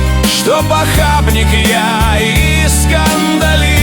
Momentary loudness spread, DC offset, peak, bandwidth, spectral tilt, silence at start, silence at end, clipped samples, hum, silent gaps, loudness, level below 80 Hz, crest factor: 1 LU; under 0.1%; 0 dBFS; over 20 kHz; -4 dB/octave; 0 s; 0 s; under 0.1%; none; none; -10 LUFS; -16 dBFS; 10 dB